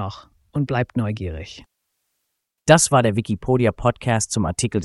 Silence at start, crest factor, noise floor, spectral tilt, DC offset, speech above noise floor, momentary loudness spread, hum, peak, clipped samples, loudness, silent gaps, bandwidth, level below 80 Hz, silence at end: 0 s; 20 dB; -77 dBFS; -5 dB/octave; under 0.1%; 57 dB; 16 LU; none; 0 dBFS; under 0.1%; -20 LUFS; none; 12 kHz; -42 dBFS; 0 s